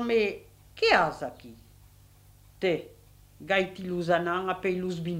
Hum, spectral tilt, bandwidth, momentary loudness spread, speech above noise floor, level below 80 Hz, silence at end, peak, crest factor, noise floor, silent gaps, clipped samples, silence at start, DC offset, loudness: none; -5.5 dB/octave; 16 kHz; 16 LU; 28 dB; -58 dBFS; 0 s; -6 dBFS; 22 dB; -56 dBFS; none; under 0.1%; 0 s; under 0.1%; -28 LUFS